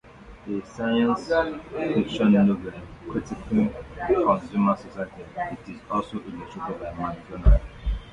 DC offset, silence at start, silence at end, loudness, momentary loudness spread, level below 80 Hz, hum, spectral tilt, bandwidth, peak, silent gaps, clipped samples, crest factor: under 0.1%; 0.05 s; 0 s; -25 LUFS; 14 LU; -32 dBFS; none; -8 dB/octave; 7.8 kHz; -4 dBFS; none; under 0.1%; 20 dB